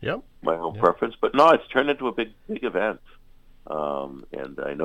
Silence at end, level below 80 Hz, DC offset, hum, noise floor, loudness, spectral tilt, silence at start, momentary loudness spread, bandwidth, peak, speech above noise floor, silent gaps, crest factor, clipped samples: 0 s; -52 dBFS; under 0.1%; none; -49 dBFS; -24 LUFS; -6 dB/octave; 0 s; 17 LU; 11 kHz; -4 dBFS; 25 dB; none; 22 dB; under 0.1%